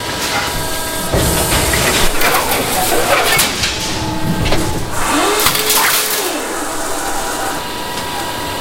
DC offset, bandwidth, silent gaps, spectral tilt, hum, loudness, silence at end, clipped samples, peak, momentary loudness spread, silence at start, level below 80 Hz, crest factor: under 0.1%; 17 kHz; none; -2.5 dB/octave; none; -14 LUFS; 0 s; under 0.1%; 0 dBFS; 9 LU; 0 s; -26 dBFS; 16 dB